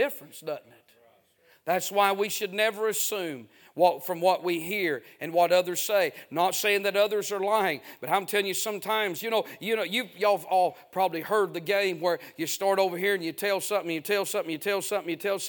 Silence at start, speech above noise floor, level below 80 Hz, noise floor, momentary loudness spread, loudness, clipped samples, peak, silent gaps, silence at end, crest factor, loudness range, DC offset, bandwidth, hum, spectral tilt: 0 s; 36 dB; -82 dBFS; -63 dBFS; 6 LU; -27 LUFS; under 0.1%; -8 dBFS; none; 0 s; 20 dB; 2 LU; under 0.1%; 19.5 kHz; none; -2.5 dB/octave